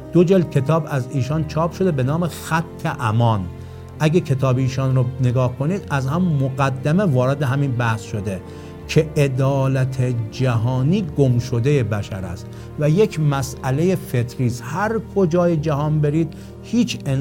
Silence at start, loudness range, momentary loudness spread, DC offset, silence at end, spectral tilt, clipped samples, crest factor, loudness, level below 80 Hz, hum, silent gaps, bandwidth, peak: 0 s; 1 LU; 8 LU; under 0.1%; 0 s; -7.5 dB/octave; under 0.1%; 16 dB; -20 LUFS; -44 dBFS; none; none; 16.5 kHz; -2 dBFS